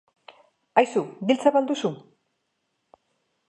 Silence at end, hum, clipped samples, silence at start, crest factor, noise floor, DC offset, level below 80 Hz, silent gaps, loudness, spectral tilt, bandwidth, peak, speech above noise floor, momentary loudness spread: 1.5 s; none; under 0.1%; 0.75 s; 22 dB; -76 dBFS; under 0.1%; -78 dBFS; none; -23 LUFS; -5.5 dB/octave; 11 kHz; -4 dBFS; 54 dB; 9 LU